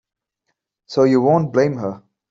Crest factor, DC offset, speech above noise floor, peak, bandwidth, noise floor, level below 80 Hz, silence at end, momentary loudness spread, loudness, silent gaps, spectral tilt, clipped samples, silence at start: 16 dB; under 0.1%; 58 dB; -4 dBFS; 7.6 kHz; -75 dBFS; -62 dBFS; 0.35 s; 12 LU; -17 LUFS; none; -7.5 dB/octave; under 0.1%; 0.9 s